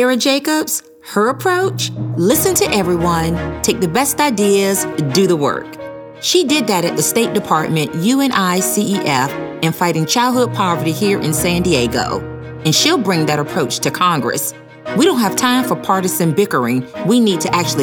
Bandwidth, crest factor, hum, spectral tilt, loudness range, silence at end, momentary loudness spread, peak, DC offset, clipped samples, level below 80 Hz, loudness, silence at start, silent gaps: over 20 kHz; 14 dB; none; -4 dB/octave; 1 LU; 0 s; 7 LU; 0 dBFS; under 0.1%; under 0.1%; -44 dBFS; -15 LUFS; 0 s; none